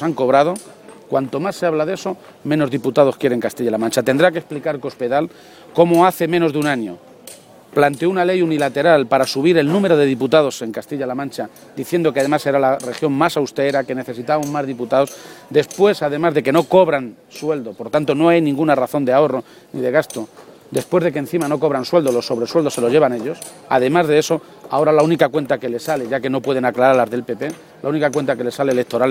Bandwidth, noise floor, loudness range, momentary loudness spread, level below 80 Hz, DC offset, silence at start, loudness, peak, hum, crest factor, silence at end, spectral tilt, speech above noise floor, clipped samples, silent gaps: 16.5 kHz; -41 dBFS; 3 LU; 11 LU; -62 dBFS; under 0.1%; 0 s; -17 LUFS; 0 dBFS; none; 16 dB; 0 s; -5.5 dB/octave; 24 dB; under 0.1%; none